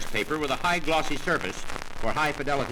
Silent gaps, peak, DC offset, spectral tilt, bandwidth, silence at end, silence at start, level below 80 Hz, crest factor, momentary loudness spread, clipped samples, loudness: none; -12 dBFS; under 0.1%; -4 dB/octave; 18 kHz; 0 s; 0 s; -38 dBFS; 16 dB; 8 LU; under 0.1%; -27 LUFS